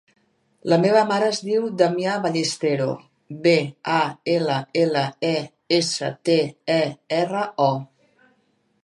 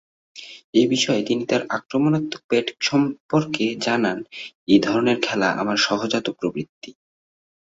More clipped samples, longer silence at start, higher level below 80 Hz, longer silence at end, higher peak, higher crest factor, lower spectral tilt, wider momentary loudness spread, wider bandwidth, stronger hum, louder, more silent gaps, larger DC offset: neither; first, 0.65 s vs 0.35 s; second, -72 dBFS vs -62 dBFS; first, 1 s vs 0.8 s; about the same, -4 dBFS vs -2 dBFS; about the same, 18 dB vs 20 dB; about the same, -5 dB/octave vs -4.5 dB/octave; second, 6 LU vs 13 LU; first, 11.5 kHz vs 7.8 kHz; neither; about the same, -22 LUFS vs -21 LUFS; second, none vs 0.64-0.73 s, 2.44-2.49 s, 3.20-3.29 s, 4.55-4.67 s, 6.69-6.81 s; neither